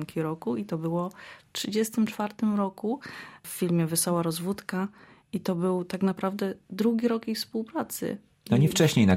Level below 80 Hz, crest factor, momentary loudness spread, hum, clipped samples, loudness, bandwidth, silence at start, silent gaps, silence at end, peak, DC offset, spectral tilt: -62 dBFS; 18 dB; 11 LU; none; under 0.1%; -28 LUFS; 16.5 kHz; 0 s; none; 0 s; -10 dBFS; under 0.1%; -5.5 dB/octave